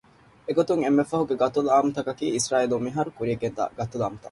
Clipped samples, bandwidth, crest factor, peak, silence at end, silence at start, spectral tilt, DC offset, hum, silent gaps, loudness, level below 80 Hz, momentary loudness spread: under 0.1%; 11.5 kHz; 16 dB; -8 dBFS; 0 s; 0.5 s; -5.5 dB/octave; under 0.1%; none; none; -25 LUFS; -58 dBFS; 8 LU